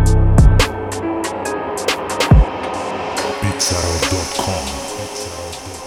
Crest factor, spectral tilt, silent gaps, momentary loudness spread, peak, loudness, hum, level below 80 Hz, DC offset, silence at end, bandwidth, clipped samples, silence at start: 16 dB; -4.5 dB/octave; none; 12 LU; 0 dBFS; -18 LUFS; none; -20 dBFS; under 0.1%; 0 s; 16.5 kHz; under 0.1%; 0 s